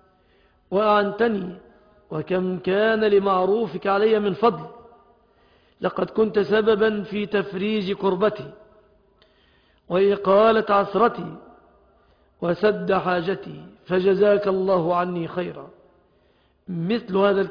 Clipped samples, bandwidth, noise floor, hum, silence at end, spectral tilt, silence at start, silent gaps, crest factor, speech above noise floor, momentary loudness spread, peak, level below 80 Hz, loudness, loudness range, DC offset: under 0.1%; 5.2 kHz; -61 dBFS; none; 0 s; -8.5 dB/octave; 0.7 s; none; 16 dB; 40 dB; 14 LU; -6 dBFS; -60 dBFS; -21 LUFS; 3 LU; under 0.1%